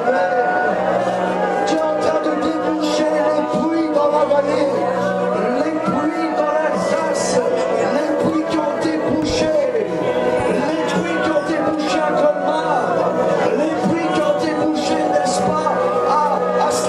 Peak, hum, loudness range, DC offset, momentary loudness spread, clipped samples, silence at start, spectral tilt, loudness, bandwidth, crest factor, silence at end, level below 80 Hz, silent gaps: -2 dBFS; none; 1 LU; under 0.1%; 3 LU; under 0.1%; 0 s; -5 dB/octave; -18 LUFS; 12.5 kHz; 14 dB; 0 s; -50 dBFS; none